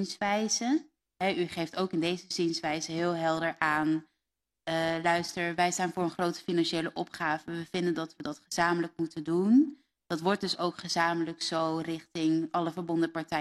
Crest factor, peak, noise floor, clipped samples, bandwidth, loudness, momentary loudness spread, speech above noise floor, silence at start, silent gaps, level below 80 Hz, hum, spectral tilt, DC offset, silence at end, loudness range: 20 dB; -10 dBFS; -87 dBFS; under 0.1%; 13 kHz; -30 LUFS; 7 LU; 57 dB; 0 s; none; -68 dBFS; none; -4.5 dB/octave; under 0.1%; 0 s; 2 LU